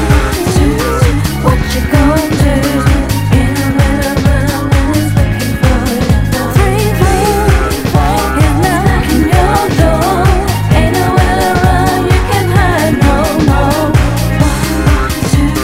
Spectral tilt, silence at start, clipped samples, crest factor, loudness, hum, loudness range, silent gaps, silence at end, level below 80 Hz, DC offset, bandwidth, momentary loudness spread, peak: -6 dB/octave; 0 s; 0.9%; 10 dB; -11 LUFS; none; 1 LU; none; 0 s; -16 dBFS; under 0.1%; 16.5 kHz; 2 LU; 0 dBFS